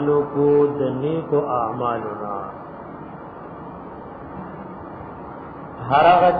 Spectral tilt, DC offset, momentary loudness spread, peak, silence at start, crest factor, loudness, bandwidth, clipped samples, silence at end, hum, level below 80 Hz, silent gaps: -10 dB/octave; under 0.1%; 19 LU; -4 dBFS; 0 s; 18 dB; -20 LUFS; 4.9 kHz; under 0.1%; 0 s; none; -52 dBFS; none